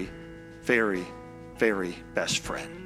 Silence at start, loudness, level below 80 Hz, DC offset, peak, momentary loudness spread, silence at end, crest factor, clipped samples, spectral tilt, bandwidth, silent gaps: 0 s; -28 LUFS; -52 dBFS; under 0.1%; -8 dBFS; 19 LU; 0 s; 22 dB; under 0.1%; -3.5 dB/octave; 15.5 kHz; none